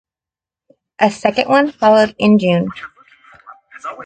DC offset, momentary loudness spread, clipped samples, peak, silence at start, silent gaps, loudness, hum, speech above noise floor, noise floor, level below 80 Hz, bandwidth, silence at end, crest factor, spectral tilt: under 0.1%; 19 LU; under 0.1%; 0 dBFS; 1 s; none; -14 LUFS; none; 76 dB; -89 dBFS; -56 dBFS; 9.2 kHz; 0 s; 16 dB; -6.5 dB/octave